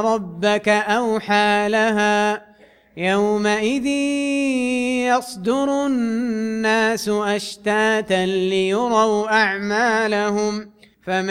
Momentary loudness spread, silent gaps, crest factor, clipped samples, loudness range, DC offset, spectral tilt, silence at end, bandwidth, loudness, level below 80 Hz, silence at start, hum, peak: 6 LU; none; 16 dB; under 0.1%; 2 LU; under 0.1%; -4.5 dB/octave; 0 s; 15.5 kHz; -19 LUFS; -58 dBFS; 0 s; none; -4 dBFS